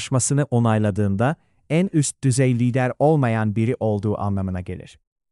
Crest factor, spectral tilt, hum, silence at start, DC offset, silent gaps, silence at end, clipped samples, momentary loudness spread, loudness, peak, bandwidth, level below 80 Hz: 14 dB; -6 dB/octave; none; 0 s; under 0.1%; none; 0.45 s; under 0.1%; 8 LU; -21 LUFS; -6 dBFS; 12 kHz; -54 dBFS